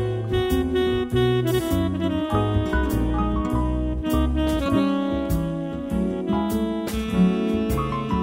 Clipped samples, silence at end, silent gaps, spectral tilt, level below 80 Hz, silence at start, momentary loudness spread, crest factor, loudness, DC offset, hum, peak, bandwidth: under 0.1%; 0 s; none; -7 dB/octave; -30 dBFS; 0 s; 5 LU; 14 dB; -23 LUFS; under 0.1%; none; -8 dBFS; 16 kHz